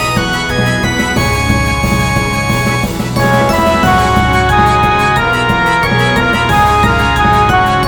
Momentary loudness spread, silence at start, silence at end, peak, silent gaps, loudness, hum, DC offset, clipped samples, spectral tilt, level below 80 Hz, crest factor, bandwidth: 4 LU; 0 s; 0 s; 0 dBFS; none; -11 LUFS; none; 0.6%; under 0.1%; -5 dB/octave; -24 dBFS; 10 dB; 19.5 kHz